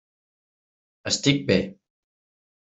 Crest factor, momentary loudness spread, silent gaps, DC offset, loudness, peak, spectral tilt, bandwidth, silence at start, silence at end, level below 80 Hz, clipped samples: 24 dB; 15 LU; none; under 0.1%; -23 LUFS; -4 dBFS; -4 dB/octave; 8.2 kHz; 1.05 s; 0.95 s; -60 dBFS; under 0.1%